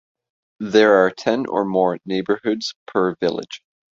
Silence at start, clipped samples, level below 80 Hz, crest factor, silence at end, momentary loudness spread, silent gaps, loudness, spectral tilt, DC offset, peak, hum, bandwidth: 0.6 s; under 0.1%; -62 dBFS; 18 dB; 0.4 s; 15 LU; 2.76-2.86 s; -19 LUFS; -5.5 dB/octave; under 0.1%; -2 dBFS; none; 7.6 kHz